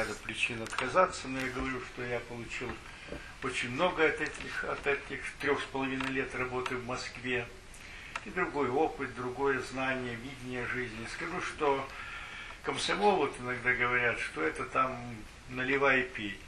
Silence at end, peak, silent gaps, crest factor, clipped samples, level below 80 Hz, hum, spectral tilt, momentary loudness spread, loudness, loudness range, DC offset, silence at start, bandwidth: 0 s; -12 dBFS; none; 22 dB; under 0.1%; -54 dBFS; none; -4 dB/octave; 13 LU; -33 LUFS; 4 LU; under 0.1%; 0 s; 12.5 kHz